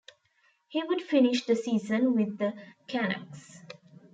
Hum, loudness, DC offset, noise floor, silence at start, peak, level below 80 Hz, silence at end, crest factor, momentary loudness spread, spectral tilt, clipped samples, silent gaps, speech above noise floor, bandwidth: none; -28 LUFS; under 0.1%; -69 dBFS; 0.7 s; -12 dBFS; -80 dBFS; 0.4 s; 16 dB; 23 LU; -5.5 dB/octave; under 0.1%; none; 41 dB; 9 kHz